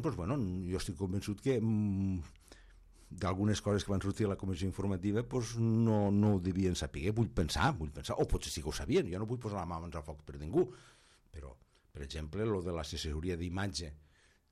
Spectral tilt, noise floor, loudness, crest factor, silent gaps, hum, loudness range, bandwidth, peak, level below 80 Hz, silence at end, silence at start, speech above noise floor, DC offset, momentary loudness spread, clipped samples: -6 dB/octave; -59 dBFS; -35 LUFS; 16 dB; none; none; 7 LU; 14 kHz; -18 dBFS; -50 dBFS; 0.55 s; 0 s; 25 dB; under 0.1%; 14 LU; under 0.1%